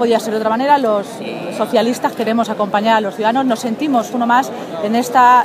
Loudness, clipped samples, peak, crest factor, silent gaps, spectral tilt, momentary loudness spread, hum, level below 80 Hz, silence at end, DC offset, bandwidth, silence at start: -16 LUFS; under 0.1%; 0 dBFS; 14 dB; none; -4.5 dB/octave; 8 LU; none; -68 dBFS; 0 s; under 0.1%; 15.5 kHz; 0 s